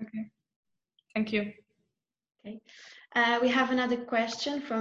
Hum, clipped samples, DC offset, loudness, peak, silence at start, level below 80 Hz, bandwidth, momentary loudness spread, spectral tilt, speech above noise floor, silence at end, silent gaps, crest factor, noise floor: none; under 0.1%; under 0.1%; -29 LUFS; -14 dBFS; 0 s; -72 dBFS; 8 kHz; 21 LU; -4 dB/octave; 55 dB; 0 s; 0.56-0.63 s; 18 dB; -84 dBFS